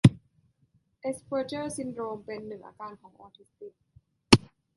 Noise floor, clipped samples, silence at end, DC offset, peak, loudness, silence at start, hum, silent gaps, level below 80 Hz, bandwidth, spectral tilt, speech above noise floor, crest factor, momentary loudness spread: -69 dBFS; under 0.1%; 0.4 s; under 0.1%; -2 dBFS; -28 LUFS; 0.05 s; none; none; -54 dBFS; 11.5 kHz; -5.5 dB/octave; 33 dB; 28 dB; 27 LU